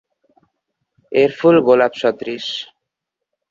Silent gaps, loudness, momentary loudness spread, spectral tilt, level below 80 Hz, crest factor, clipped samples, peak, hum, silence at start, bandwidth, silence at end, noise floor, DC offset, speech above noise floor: none; -16 LUFS; 14 LU; -6 dB/octave; -64 dBFS; 16 dB; under 0.1%; -2 dBFS; none; 1.1 s; 7.4 kHz; 0.85 s; -81 dBFS; under 0.1%; 66 dB